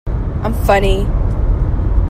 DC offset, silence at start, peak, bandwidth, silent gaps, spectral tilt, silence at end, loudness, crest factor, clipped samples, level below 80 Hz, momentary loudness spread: under 0.1%; 0.05 s; 0 dBFS; 15.5 kHz; none; -7 dB/octave; 0 s; -17 LUFS; 14 dB; under 0.1%; -16 dBFS; 6 LU